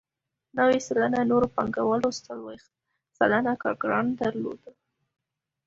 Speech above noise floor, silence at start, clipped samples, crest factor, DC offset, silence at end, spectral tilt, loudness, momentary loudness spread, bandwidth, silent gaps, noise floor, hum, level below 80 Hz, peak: 52 dB; 0.55 s; under 0.1%; 20 dB; under 0.1%; 0.95 s; -5.5 dB/octave; -25 LUFS; 14 LU; 7.8 kHz; none; -78 dBFS; none; -60 dBFS; -6 dBFS